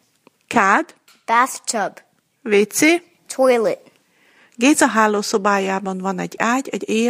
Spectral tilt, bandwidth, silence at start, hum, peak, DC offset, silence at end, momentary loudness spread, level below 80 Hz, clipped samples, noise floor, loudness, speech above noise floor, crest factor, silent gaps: -3.5 dB/octave; 15.5 kHz; 0.5 s; none; 0 dBFS; under 0.1%; 0 s; 11 LU; -68 dBFS; under 0.1%; -57 dBFS; -18 LUFS; 40 dB; 18 dB; none